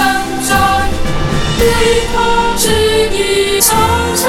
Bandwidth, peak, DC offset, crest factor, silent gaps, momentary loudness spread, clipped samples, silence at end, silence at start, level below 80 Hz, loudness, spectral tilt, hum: 18 kHz; 0 dBFS; under 0.1%; 12 dB; none; 6 LU; under 0.1%; 0 s; 0 s; -22 dBFS; -12 LUFS; -3 dB/octave; none